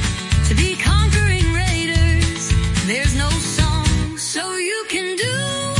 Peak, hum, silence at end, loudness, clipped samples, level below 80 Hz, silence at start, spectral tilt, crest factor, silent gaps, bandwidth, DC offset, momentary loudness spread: -2 dBFS; none; 0 s; -18 LUFS; under 0.1%; -24 dBFS; 0 s; -4 dB/octave; 16 dB; none; 11.5 kHz; under 0.1%; 5 LU